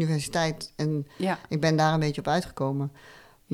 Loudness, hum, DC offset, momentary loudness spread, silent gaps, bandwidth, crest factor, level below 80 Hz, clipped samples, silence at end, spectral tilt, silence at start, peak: -27 LUFS; none; under 0.1%; 7 LU; none; 14 kHz; 16 dB; -54 dBFS; under 0.1%; 0 s; -6 dB/octave; 0 s; -10 dBFS